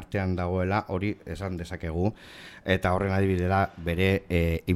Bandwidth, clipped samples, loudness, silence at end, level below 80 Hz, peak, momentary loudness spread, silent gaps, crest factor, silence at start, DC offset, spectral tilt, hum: 13.5 kHz; under 0.1%; -27 LUFS; 0 s; -42 dBFS; -10 dBFS; 10 LU; none; 18 dB; 0 s; under 0.1%; -7.5 dB/octave; none